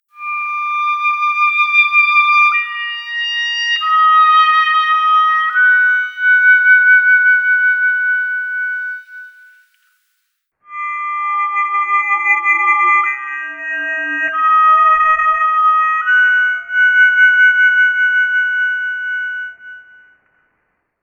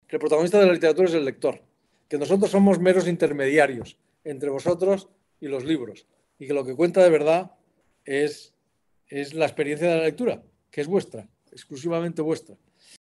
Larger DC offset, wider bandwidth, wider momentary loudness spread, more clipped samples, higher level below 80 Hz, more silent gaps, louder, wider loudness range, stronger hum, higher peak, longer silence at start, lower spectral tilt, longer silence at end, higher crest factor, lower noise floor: neither; second, 7.2 kHz vs 12 kHz; second, 12 LU vs 20 LU; neither; first, -62 dBFS vs -68 dBFS; neither; first, -12 LUFS vs -23 LUFS; about the same, 8 LU vs 6 LU; neither; first, 0 dBFS vs -4 dBFS; about the same, 0.2 s vs 0.1 s; second, 1.5 dB/octave vs -6 dB/octave; first, 1.2 s vs 0.6 s; second, 12 dB vs 18 dB; about the same, -69 dBFS vs -72 dBFS